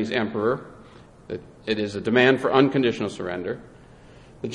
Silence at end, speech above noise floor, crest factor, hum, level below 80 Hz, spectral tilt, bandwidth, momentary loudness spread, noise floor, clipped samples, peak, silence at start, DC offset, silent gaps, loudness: 0 s; 25 dB; 22 dB; none; -56 dBFS; -6 dB/octave; 11 kHz; 18 LU; -48 dBFS; under 0.1%; -4 dBFS; 0 s; under 0.1%; none; -23 LUFS